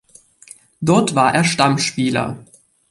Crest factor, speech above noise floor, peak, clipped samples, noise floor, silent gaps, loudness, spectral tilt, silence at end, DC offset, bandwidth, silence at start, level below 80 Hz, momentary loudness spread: 18 dB; 29 dB; -2 dBFS; under 0.1%; -45 dBFS; none; -17 LUFS; -4.5 dB/octave; 0.45 s; under 0.1%; 11.5 kHz; 0.8 s; -54 dBFS; 10 LU